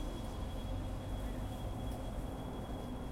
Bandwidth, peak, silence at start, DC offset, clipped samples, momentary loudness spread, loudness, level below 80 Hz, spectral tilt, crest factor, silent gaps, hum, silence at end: 16.5 kHz; -28 dBFS; 0 s; under 0.1%; under 0.1%; 1 LU; -43 LUFS; -44 dBFS; -6.5 dB/octave; 12 dB; none; none; 0 s